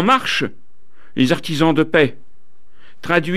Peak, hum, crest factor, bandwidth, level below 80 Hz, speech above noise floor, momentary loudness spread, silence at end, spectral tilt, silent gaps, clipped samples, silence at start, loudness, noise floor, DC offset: -2 dBFS; none; 18 dB; 14.5 kHz; -54 dBFS; 43 dB; 13 LU; 0 s; -5.5 dB/octave; none; under 0.1%; 0 s; -17 LUFS; -59 dBFS; 4%